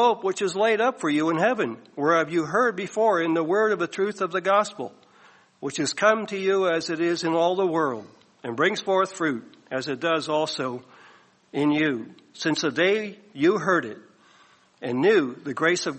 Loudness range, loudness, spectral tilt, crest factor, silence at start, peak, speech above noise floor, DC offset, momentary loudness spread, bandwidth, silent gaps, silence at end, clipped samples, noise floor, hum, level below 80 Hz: 3 LU; -24 LUFS; -4.5 dB/octave; 18 dB; 0 s; -6 dBFS; 34 dB; under 0.1%; 12 LU; 8.8 kHz; none; 0 s; under 0.1%; -57 dBFS; none; -72 dBFS